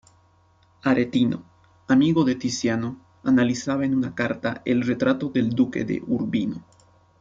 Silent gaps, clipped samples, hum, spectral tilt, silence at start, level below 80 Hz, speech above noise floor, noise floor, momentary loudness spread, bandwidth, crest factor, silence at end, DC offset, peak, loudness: none; under 0.1%; none; -6 dB/octave; 0.85 s; -58 dBFS; 37 dB; -59 dBFS; 8 LU; 7.6 kHz; 16 dB; 0.6 s; under 0.1%; -8 dBFS; -23 LUFS